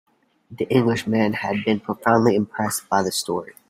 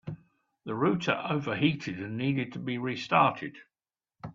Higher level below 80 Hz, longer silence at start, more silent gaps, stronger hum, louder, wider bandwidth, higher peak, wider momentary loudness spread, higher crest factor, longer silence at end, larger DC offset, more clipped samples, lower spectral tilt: first, -60 dBFS vs -68 dBFS; first, 0.5 s vs 0.05 s; neither; neither; first, -21 LUFS vs -29 LUFS; first, 16 kHz vs 7.6 kHz; first, -2 dBFS vs -8 dBFS; second, 7 LU vs 18 LU; about the same, 20 dB vs 22 dB; first, 0.2 s vs 0 s; neither; neither; second, -5 dB/octave vs -6.5 dB/octave